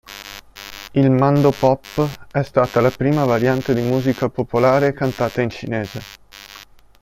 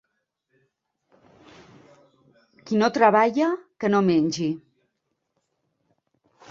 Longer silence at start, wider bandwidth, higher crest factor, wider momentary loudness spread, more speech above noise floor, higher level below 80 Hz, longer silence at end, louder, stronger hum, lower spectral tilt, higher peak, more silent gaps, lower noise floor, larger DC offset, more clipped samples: second, 0.1 s vs 2.65 s; first, 16.5 kHz vs 7.8 kHz; second, 16 dB vs 22 dB; first, 20 LU vs 10 LU; second, 26 dB vs 57 dB; first, -48 dBFS vs -68 dBFS; second, 0.35 s vs 1.9 s; first, -18 LUFS vs -22 LUFS; neither; first, -7.5 dB/octave vs -6 dB/octave; about the same, -2 dBFS vs -4 dBFS; neither; second, -43 dBFS vs -77 dBFS; neither; neither